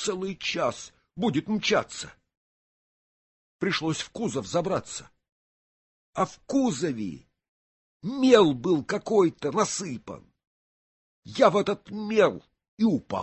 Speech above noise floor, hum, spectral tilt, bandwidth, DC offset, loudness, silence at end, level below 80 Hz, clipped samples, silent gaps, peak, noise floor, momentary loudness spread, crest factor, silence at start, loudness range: over 65 dB; none; -4.5 dB/octave; 8.6 kHz; under 0.1%; -26 LUFS; 0 s; -62 dBFS; under 0.1%; 2.37-3.59 s, 5.32-6.13 s, 7.48-8.00 s, 10.47-11.23 s, 12.68-12.77 s; -6 dBFS; under -90 dBFS; 17 LU; 22 dB; 0 s; 7 LU